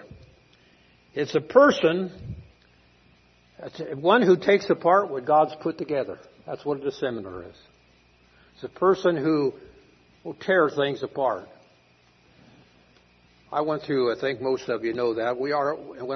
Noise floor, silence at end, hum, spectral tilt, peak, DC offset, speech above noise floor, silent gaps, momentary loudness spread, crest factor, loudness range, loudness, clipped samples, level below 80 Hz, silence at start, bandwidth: -60 dBFS; 0 s; none; -6 dB/octave; -4 dBFS; under 0.1%; 36 dB; none; 20 LU; 22 dB; 7 LU; -24 LUFS; under 0.1%; -62 dBFS; 0.1 s; 6.4 kHz